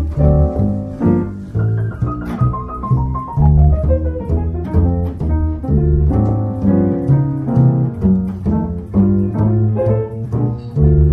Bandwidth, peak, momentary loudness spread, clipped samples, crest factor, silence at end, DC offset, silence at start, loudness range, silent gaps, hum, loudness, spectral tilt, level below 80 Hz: 2.7 kHz; 0 dBFS; 6 LU; under 0.1%; 14 dB; 0 s; under 0.1%; 0 s; 2 LU; none; none; -16 LUFS; -12 dB/octave; -20 dBFS